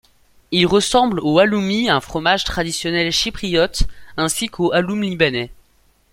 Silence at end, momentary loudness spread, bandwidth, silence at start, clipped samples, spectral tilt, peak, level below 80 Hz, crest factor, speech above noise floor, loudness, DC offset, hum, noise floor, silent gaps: 0.6 s; 7 LU; 16.5 kHz; 0.5 s; under 0.1%; -4 dB/octave; -2 dBFS; -34 dBFS; 18 dB; 40 dB; -18 LUFS; under 0.1%; none; -57 dBFS; none